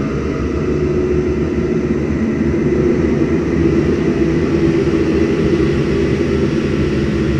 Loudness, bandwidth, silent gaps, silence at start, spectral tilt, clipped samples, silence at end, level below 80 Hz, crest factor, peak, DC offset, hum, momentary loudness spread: -16 LUFS; 9 kHz; none; 0 s; -8 dB/octave; under 0.1%; 0 s; -28 dBFS; 12 dB; -2 dBFS; under 0.1%; none; 3 LU